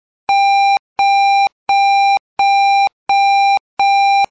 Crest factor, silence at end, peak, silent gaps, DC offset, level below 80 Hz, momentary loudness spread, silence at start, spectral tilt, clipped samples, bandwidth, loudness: 4 dB; 0.05 s; -10 dBFS; 0.79-0.96 s, 1.52-1.66 s, 2.20-2.37 s, 2.93-3.06 s, 3.60-3.77 s; under 0.1%; -62 dBFS; 4 LU; 0.3 s; 1 dB/octave; under 0.1%; 8 kHz; -13 LUFS